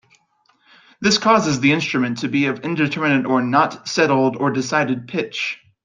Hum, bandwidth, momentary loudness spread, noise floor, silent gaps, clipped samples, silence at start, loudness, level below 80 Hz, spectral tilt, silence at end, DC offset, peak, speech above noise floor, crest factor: none; 9.4 kHz; 7 LU; -61 dBFS; none; under 0.1%; 1 s; -18 LUFS; -60 dBFS; -4.5 dB/octave; 0.3 s; under 0.1%; -2 dBFS; 43 dB; 18 dB